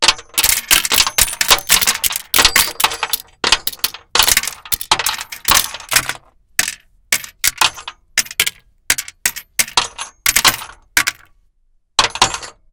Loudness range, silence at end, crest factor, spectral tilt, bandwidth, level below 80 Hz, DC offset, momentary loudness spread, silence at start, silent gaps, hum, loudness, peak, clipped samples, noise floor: 5 LU; 0.25 s; 18 dB; 1 dB/octave; over 20 kHz; -40 dBFS; under 0.1%; 9 LU; 0 s; none; none; -14 LUFS; 0 dBFS; under 0.1%; -58 dBFS